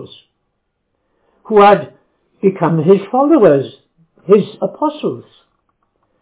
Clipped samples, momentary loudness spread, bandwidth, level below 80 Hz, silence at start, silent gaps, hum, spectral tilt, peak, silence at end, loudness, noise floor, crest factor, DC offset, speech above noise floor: under 0.1%; 17 LU; 4 kHz; -60 dBFS; 0 s; none; none; -11.5 dB/octave; 0 dBFS; 1 s; -13 LUFS; -69 dBFS; 14 dB; under 0.1%; 57 dB